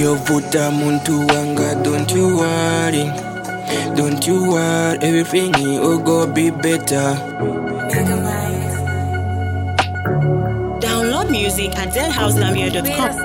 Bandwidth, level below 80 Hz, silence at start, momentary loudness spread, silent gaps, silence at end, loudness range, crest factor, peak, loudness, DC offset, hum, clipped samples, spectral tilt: 17 kHz; -38 dBFS; 0 s; 6 LU; none; 0 s; 3 LU; 16 dB; 0 dBFS; -17 LUFS; under 0.1%; none; under 0.1%; -5 dB/octave